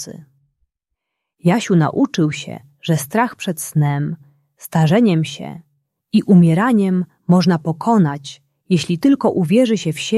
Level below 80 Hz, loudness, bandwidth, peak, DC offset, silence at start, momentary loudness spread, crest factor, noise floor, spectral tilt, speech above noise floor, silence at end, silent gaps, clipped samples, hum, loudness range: -60 dBFS; -16 LUFS; 13.5 kHz; -2 dBFS; under 0.1%; 0 s; 15 LU; 14 dB; -78 dBFS; -6.5 dB/octave; 63 dB; 0 s; none; under 0.1%; none; 4 LU